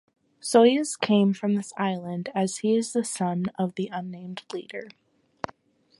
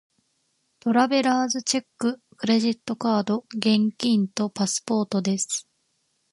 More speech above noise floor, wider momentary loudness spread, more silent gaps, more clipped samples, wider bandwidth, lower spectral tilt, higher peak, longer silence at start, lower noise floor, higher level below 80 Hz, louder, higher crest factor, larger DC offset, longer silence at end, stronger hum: second, 30 dB vs 48 dB; first, 18 LU vs 7 LU; neither; neither; about the same, 11.5 kHz vs 11.5 kHz; about the same, -5 dB/octave vs -4 dB/octave; about the same, -4 dBFS vs -6 dBFS; second, 0.45 s vs 0.85 s; second, -55 dBFS vs -71 dBFS; about the same, -70 dBFS vs -72 dBFS; about the same, -25 LUFS vs -24 LUFS; about the same, 22 dB vs 18 dB; neither; first, 1.1 s vs 0.7 s; neither